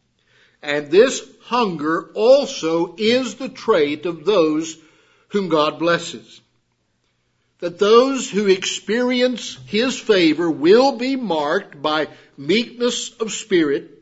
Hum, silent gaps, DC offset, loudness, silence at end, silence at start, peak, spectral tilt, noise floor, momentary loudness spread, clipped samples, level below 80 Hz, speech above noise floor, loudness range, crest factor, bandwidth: none; none; under 0.1%; -18 LUFS; 0.15 s; 0.65 s; 0 dBFS; -4 dB/octave; -67 dBFS; 12 LU; under 0.1%; -66 dBFS; 49 dB; 4 LU; 18 dB; 8 kHz